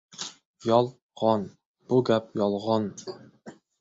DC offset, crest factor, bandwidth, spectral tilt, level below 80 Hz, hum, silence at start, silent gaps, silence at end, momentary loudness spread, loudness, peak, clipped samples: under 0.1%; 22 dB; 8 kHz; -6 dB/octave; -66 dBFS; none; 0.2 s; 0.45-0.54 s, 1.02-1.09 s, 1.66-1.74 s; 0.3 s; 17 LU; -26 LUFS; -6 dBFS; under 0.1%